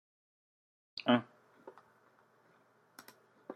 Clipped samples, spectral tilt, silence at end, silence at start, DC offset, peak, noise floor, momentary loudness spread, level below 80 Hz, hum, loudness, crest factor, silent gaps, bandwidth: under 0.1%; -6 dB/octave; 0 s; 0.95 s; under 0.1%; -16 dBFS; -69 dBFS; 26 LU; -88 dBFS; none; -34 LUFS; 26 dB; none; 13.5 kHz